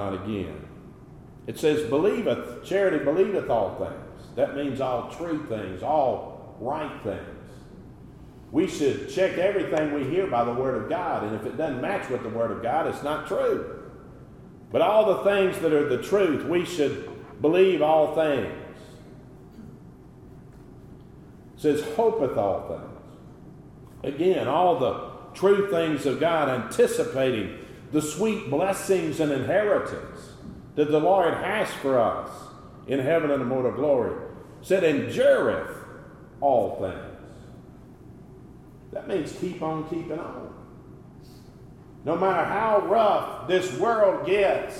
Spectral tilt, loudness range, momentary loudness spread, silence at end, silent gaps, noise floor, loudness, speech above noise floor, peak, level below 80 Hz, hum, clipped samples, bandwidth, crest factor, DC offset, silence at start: -6 dB/octave; 7 LU; 20 LU; 0 s; none; -47 dBFS; -25 LUFS; 23 dB; -8 dBFS; -56 dBFS; none; under 0.1%; 15.5 kHz; 18 dB; under 0.1%; 0 s